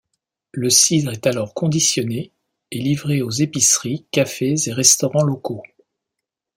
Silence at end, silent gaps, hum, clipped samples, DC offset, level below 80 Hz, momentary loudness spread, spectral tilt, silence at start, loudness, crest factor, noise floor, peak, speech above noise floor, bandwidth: 0.9 s; none; none; under 0.1%; under 0.1%; -60 dBFS; 16 LU; -3.5 dB/octave; 0.55 s; -17 LUFS; 20 dB; -82 dBFS; 0 dBFS; 64 dB; 16.5 kHz